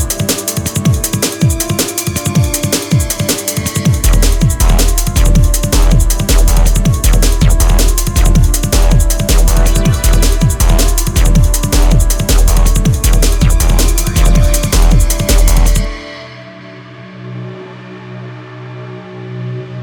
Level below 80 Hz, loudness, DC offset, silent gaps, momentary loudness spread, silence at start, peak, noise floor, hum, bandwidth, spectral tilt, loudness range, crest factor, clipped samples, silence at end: -12 dBFS; -12 LUFS; under 0.1%; none; 17 LU; 0 s; 0 dBFS; -31 dBFS; none; over 20 kHz; -4.5 dB/octave; 6 LU; 10 dB; under 0.1%; 0 s